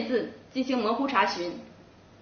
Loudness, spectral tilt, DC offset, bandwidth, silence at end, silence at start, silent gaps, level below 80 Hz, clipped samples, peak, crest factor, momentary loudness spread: -28 LUFS; -2 dB/octave; under 0.1%; 6.6 kHz; 0.4 s; 0 s; none; -66 dBFS; under 0.1%; -10 dBFS; 20 dB; 11 LU